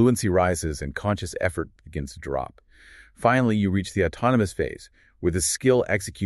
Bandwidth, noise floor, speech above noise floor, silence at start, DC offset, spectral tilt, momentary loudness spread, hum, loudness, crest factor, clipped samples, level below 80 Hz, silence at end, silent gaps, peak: 13 kHz; -51 dBFS; 27 dB; 0 s; under 0.1%; -5.5 dB/octave; 13 LU; none; -24 LUFS; 20 dB; under 0.1%; -44 dBFS; 0 s; none; -4 dBFS